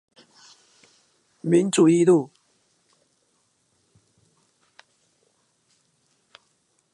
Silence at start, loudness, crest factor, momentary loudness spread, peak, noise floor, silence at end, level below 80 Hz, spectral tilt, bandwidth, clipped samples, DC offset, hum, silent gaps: 1.45 s; -19 LUFS; 20 dB; 16 LU; -6 dBFS; -68 dBFS; 4.7 s; -78 dBFS; -6 dB/octave; 11.5 kHz; under 0.1%; under 0.1%; none; none